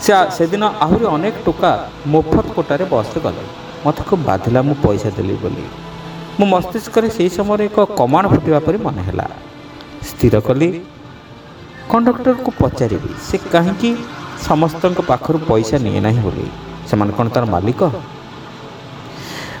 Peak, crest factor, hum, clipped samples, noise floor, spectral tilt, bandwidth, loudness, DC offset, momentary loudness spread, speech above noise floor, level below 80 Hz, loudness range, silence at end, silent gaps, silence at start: 0 dBFS; 16 dB; none; under 0.1%; -36 dBFS; -7 dB/octave; 19.5 kHz; -16 LUFS; under 0.1%; 18 LU; 21 dB; -38 dBFS; 3 LU; 0 s; none; 0 s